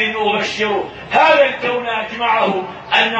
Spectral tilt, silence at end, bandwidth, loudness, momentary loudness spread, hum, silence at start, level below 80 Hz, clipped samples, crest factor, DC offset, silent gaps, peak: -3.5 dB/octave; 0 s; 8.4 kHz; -16 LUFS; 9 LU; none; 0 s; -54 dBFS; under 0.1%; 16 dB; under 0.1%; none; 0 dBFS